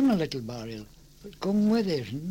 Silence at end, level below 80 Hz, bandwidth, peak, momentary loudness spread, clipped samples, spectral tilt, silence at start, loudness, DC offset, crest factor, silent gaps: 0 s; -54 dBFS; 16.5 kHz; -16 dBFS; 20 LU; under 0.1%; -7 dB/octave; 0 s; -28 LUFS; under 0.1%; 12 dB; none